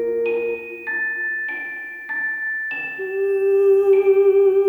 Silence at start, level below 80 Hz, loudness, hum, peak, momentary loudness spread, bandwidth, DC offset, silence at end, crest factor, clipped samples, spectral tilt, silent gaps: 0 s; -64 dBFS; -20 LUFS; none; -8 dBFS; 12 LU; 3.6 kHz; under 0.1%; 0 s; 12 dB; under 0.1%; -6 dB/octave; none